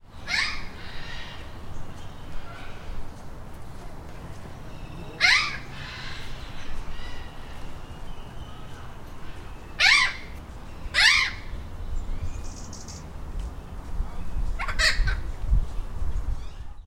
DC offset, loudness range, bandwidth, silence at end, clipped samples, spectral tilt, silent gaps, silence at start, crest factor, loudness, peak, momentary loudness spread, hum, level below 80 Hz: under 0.1%; 19 LU; 14.5 kHz; 0 s; under 0.1%; -2 dB/octave; none; 0.05 s; 22 dB; -24 LUFS; -4 dBFS; 23 LU; none; -34 dBFS